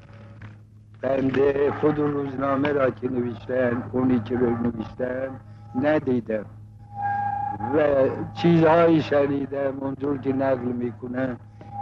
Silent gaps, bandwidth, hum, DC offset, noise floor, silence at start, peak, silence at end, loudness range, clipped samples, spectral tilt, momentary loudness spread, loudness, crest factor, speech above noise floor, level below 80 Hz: none; 6.8 kHz; none; under 0.1%; -47 dBFS; 0.05 s; -8 dBFS; 0 s; 4 LU; under 0.1%; -9 dB/octave; 12 LU; -24 LUFS; 16 dB; 25 dB; -52 dBFS